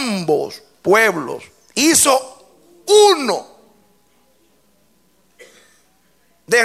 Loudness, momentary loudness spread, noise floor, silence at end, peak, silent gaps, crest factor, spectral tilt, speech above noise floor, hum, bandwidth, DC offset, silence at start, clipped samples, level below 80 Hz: -15 LUFS; 18 LU; -59 dBFS; 0 s; 0 dBFS; none; 18 dB; -2 dB/octave; 45 dB; none; 16 kHz; under 0.1%; 0 s; under 0.1%; -62 dBFS